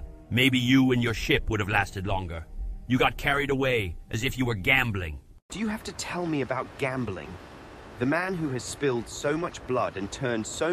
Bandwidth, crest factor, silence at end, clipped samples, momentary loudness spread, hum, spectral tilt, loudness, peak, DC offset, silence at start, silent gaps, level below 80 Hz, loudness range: 15 kHz; 20 dB; 0 s; under 0.1%; 16 LU; none; -5 dB/octave; -27 LUFS; -6 dBFS; under 0.1%; 0 s; 5.42-5.49 s; -42 dBFS; 6 LU